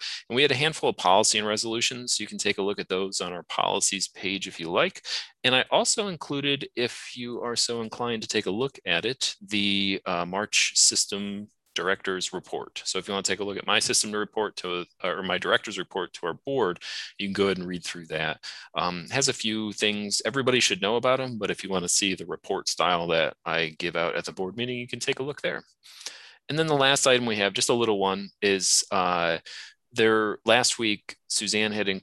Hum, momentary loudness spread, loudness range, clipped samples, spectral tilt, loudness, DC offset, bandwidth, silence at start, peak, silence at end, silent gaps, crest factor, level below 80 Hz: none; 11 LU; 5 LU; under 0.1%; -2 dB/octave; -25 LUFS; under 0.1%; 13 kHz; 0 s; -4 dBFS; 0.05 s; none; 22 dB; -62 dBFS